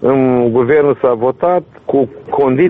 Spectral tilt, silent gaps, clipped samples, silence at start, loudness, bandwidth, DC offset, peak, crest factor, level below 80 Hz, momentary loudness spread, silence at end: -10.5 dB/octave; none; under 0.1%; 0 s; -13 LUFS; 3.9 kHz; under 0.1%; -2 dBFS; 10 dB; -50 dBFS; 6 LU; 0 s